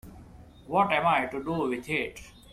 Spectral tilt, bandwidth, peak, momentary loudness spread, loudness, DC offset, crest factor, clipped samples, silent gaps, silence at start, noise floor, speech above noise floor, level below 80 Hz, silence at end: -5.5 dB/octave; 15.5 kHz; -10 dBFS; 9 LU; -27 LUFS; under 0.1%; 18 dB; under 0.1%; none; 0.05 s; -50 dBFS; 22 dB; -54 dBFS; 0 s